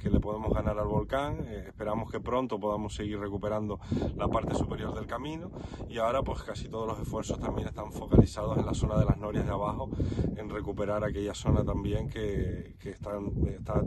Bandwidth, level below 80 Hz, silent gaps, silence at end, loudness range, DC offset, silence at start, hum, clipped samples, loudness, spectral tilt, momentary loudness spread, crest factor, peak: 12.5 kHz; -40 dBFS; none; 0 s; 4 LU; under 0.1%; 0 s; none; under 0.1%; -32 LUFS; -7.5 dB/octave; 9 LU; 26 dB; -4 dBFS